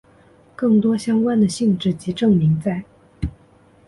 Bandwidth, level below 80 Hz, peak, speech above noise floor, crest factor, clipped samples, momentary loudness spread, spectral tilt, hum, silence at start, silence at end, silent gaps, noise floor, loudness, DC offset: 11.5 kHz; -42 dBFS; -6 dBFS; 34 dB; 14 dB; under 0.1%; 14 LU; -7 dB/octave; none; 0.6 s; 0.55 s; none; -52 dBFS; -19 LUFS; under 0.1%